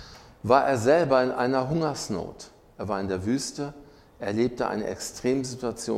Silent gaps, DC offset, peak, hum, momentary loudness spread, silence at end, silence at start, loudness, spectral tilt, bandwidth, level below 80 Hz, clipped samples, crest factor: none; under 0.1%; -6 dBFS; none; 15 LU; 0 s; 0 s; -26 LUFS; -5 dB/octave; 15.5 kHz; -54 dBFS; under 0.1%; 22 dB